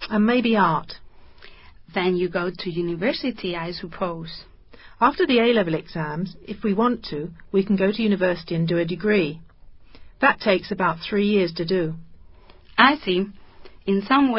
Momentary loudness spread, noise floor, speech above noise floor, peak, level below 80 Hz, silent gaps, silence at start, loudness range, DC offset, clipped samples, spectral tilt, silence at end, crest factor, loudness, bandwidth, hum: 13 LU; -47 dBFS; 25 dB; 0 dBFS; -52 dBFS; none; 0 s; 5 LU; under 0.1%; under 0.1%; -10.5 dB/octave; 0 s; 22 dB; -22 LUFS; 5.8 kHz; none